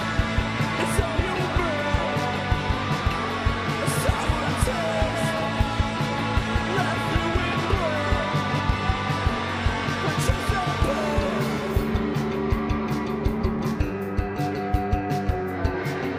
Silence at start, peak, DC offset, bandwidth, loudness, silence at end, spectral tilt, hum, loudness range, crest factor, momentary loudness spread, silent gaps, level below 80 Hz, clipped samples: 0 s; -8 dBFS; under 0.1%; 15.5 kHz; -25 LUFS; 0 s; -5.5 dB/octave; none; 2 LU; 16 dB; 3 LU; none; -32 dBFS; under 0.1%